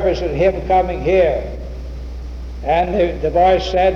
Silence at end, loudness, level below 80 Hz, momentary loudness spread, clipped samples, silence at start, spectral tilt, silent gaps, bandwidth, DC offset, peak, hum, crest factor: 0 s; -16 LUFS; -28 dBFS; 16 LU; under 0.1%; 0 s; -7 dB/octave; none; 7.2 kHz; under 0.1%; -4 dBFS; none; 12 dB